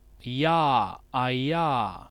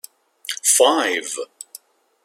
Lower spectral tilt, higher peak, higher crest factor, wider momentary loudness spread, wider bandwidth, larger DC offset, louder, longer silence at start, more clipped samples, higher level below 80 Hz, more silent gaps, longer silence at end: first, -7 dB/octave vs 1 dB/octave; second, -10 dBFS vs -2 dBFS; about the same, 16 dB vs 20 dB; second, 7 LU vs 22 LU; second, 12 kHz vs 16.5 kHz; neither; second, -26 LUFS vs -17 LUFS; second, 0.25 s vs 0.5 s; neither; first, -54 dBFS vs -80 dBFS; neither; second, 0.05 s vs 0.8 s